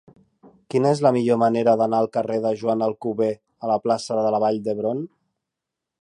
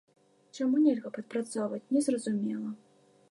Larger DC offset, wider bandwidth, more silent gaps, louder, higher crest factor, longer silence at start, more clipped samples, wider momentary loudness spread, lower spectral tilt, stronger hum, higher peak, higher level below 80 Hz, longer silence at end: neither; about the same, 11 kHz vs 11.5 kHz; neither; first, -22 LUFS vs -31 LUFS; about the same, 18 dB vs 16 dB; first, 0.75 s vs 0.55 s; neither; second, 7 LU vs 13 LU; about the same, -7 dB/octave vs -6 dB/octave; neither; first, -4 dBFS vs -14 dBFS; first, -70 dBFS vs -86 dBFS; first, 0.95 s vs 0.55 s